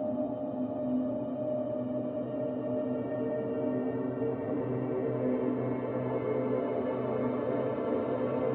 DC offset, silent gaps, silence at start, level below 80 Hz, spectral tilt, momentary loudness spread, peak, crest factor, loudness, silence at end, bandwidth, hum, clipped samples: under 0.1%; none; 0 s; -66 dBFS; -12 dB/octave; 3 LU; -18 dBFS; 14 dB; -33 LUFS; 0 s; 3.9 kHz; none; under 0.1%